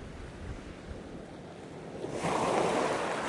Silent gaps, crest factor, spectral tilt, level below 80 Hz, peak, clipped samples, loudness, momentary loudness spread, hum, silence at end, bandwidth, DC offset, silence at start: none; 18 dB; -4.5 dB/octave; -52 dBFS; -16 dBFS; under 0.1%; -33 LUFS; 17 LU; none; 0 s; 11.5 kHz; under 0.1%; 0 s